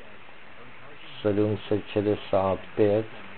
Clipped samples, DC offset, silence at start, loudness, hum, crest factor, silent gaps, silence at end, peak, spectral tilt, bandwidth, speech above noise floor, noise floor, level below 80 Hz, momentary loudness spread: under 0.1%; 0.9%; 0.05 s; -26 LUFS; none; 18 dB; none; 0 s; -10 dBFS; -11 dB/octave; 4.4 kHz; 23 dB; -49 dBFS; -60 dBFS; 23 LU